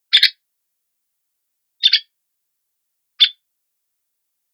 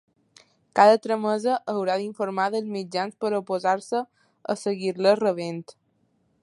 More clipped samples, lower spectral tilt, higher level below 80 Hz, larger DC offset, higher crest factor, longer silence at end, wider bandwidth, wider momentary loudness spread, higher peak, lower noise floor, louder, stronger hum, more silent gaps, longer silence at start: neither; second, 4 dB/octave vs -5 dB/octave; about the same, -78 dBFS vs -78 dBFS; neither; about the same, 22 dB vs 22 dB; first, 1.2 s vs 0.7 s; first, over 20 kHz vs 11.5 kHz; second, 4 LU vs 13 LU; about the same, 0 dBFS vs -2 dBFS; first, -73 dBFS vs -68 dBFS; first, -15 LUFS vs -24 LUFS; neither; neither; second, 0.1 s vs 0.75 s